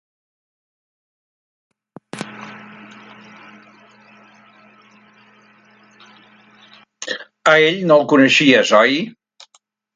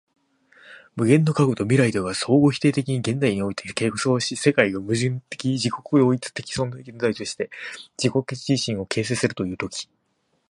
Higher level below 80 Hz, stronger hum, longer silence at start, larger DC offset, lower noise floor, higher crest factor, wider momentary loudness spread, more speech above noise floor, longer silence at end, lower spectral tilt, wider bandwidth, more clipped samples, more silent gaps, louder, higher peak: second, -70 dBFS vs -56 dBFS; neither; first, 2.15 s vs 0.65 s; neither; second, -59 dBFS vs -70 dBFS; about the same, 20 dB vs 22 dB; first, 24 LU vs 11 LU; about the same, 47 dB vs 48 dB; first, 0.85 s vs 0.65 s; second, -4 dB/octave vs -5.5 dB/octave; about the same, 11 kHz vs 11.5 kHz; neither; neither; first, -13 LUFS vs -22 LUFS; about the same, 0 dBFS vs -2 dBFS